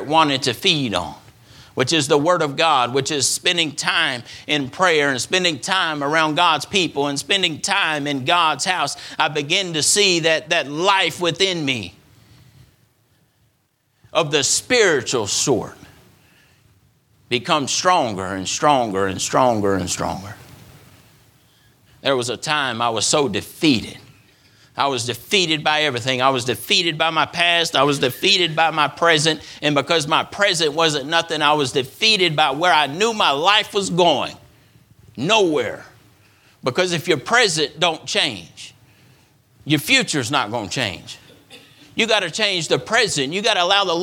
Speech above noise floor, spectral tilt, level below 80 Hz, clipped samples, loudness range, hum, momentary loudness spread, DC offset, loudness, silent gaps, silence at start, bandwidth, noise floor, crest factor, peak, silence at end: 46 dB; -2.5 dB/octave; -58 dBFS; under 0.1%; 5 LU; none; 8 LU; under 0.1%; -18 LUFS; none; 0 s; 19 kHz; -65 dBFS; 20 dB; 0 dBFS; 0 s